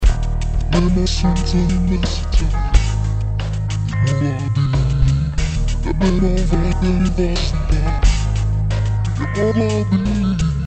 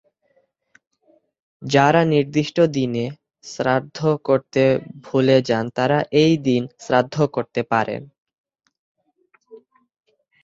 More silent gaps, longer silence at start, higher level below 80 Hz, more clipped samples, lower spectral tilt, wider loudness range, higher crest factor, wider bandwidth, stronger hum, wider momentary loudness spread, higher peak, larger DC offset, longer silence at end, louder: second, none vs 8.18-8.26 s, 8.34-8.44 s, 8.79-8.95 s; second, 0 s vs 1.6 s; first, -20 dBFS vs -60 dBFS; neither; about the same, -6.5 dB/octave vs -6.5 dB/octave; second, 1 LU vs 6 LU; about the same, 16 dB vs 20 dB; first, 8.8 kHz vs 7.8 kHz; neither; second, 4 LU vs 9 LU; about the same, 0 dBFS vs -2 dBFS; neither; second, 0 s vs 0.85 s; about the same, -18 LUFS vs -19 LUFS